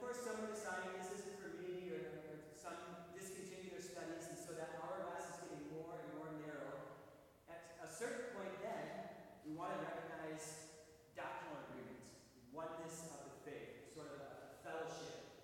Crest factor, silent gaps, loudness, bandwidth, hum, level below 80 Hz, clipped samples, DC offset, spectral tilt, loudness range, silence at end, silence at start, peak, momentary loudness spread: 18 dB; none; -51 LUFS; 17.5 kHz; none; -80 dBFS; under 0.1%; under 0.1%; -4 dB/octave; 4 LU; 0 s; 0 s; -32 dBFS; 10 LU